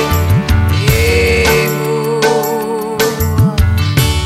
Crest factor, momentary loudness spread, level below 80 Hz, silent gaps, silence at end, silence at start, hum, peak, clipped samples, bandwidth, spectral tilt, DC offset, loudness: 10 dB; 5 LU; -22 dBFS; none; 0 s; 0 s; none; 0 dBFS; under 0.1%; 16 kHz; -5 dB/octave; under 0.1%; -12 LUFS